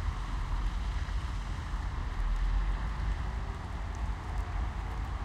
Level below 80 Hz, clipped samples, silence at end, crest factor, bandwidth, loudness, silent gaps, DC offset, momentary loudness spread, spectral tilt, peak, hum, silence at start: -34 dBFS; under 0.1%; 0 s; 12 dB; 9 kHz; -37 LUFS; none; under 0.1%; 4 LU; -6 dB/octave; -20 dBFS; none; 0 s